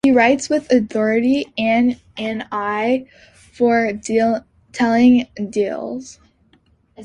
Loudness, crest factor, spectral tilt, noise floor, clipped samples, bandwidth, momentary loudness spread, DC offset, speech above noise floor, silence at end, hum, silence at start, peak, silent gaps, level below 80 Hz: -18 LUFS; 16 dB; -5 dB/octave; -57 dBFS; under 0.1%; 9.6 kHz; 12 LU; under 0.1%; 40 dB; 0 s; none; 0.05 s; -2 dBFS; none; -54 dBFS